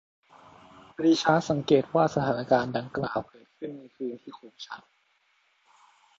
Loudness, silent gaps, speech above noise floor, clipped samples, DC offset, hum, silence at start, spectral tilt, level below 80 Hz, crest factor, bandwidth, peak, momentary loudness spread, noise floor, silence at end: -26 LUFS; none; 42 dB; under 0.1%; under 0.1%; none; 1 s; -6 dB/octave; -64 dBFS; 22 dB; 7.8 kHz; -6 dBFS; 21 LU; -69 dBFS; 1.4 s